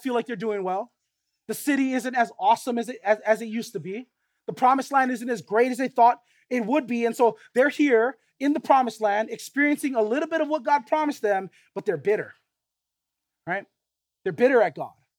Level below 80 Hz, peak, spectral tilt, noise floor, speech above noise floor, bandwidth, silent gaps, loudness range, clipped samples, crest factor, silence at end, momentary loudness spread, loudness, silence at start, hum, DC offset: -84 dBFS; -6 dBFS; -5 dB/octave; -84 dBFS; 61 dB; 18 kHz; none; 5 LU; under 0.1%; 20 dB; 0.3 s; 13 LU; -24 LUFS; 0 s; none; under 0.1%